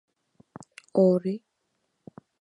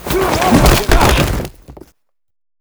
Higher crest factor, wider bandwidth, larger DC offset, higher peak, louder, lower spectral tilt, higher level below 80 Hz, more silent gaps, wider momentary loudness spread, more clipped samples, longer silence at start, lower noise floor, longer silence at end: first, 20 dB vs 14 dB; second, 10.5 kHz vs over 20 kHz; neither; second, -8 dBFS vs 0 dBFS; second, -24 LUFS vs -12 LUFS; first, -9 dB/octave vs -4.5 dB/octave; second, -76 dBFS vs -20 dBFS; neither; first, 25 LU vs 11 LU; second, under 0.1% vs 0.1%; first, 0.95 s vs 0 s; first, -76 dBFS vs -57 dBFS; about the same, 1 s vs 0.9 s